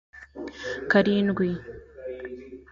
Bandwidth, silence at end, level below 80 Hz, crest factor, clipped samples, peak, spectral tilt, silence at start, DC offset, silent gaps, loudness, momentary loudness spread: 7.2 kHz; 0.1 s; -54 dBFS; 18 dB; under 0.1%; -8 dBFS; -7 dB/octave; 0.15 s; under 0.1%; none; -25 LUFS; 20 LU